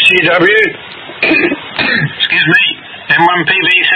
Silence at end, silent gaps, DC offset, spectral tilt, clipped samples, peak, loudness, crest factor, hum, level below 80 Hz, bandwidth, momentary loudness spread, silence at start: 0 s; none; under 0.1%; -5 dB/octave; 0.2%; 0 dBFS; -9 LUFS; 10 dB; none; -52 dBFS; 12 kHz; 7 LU; 0 s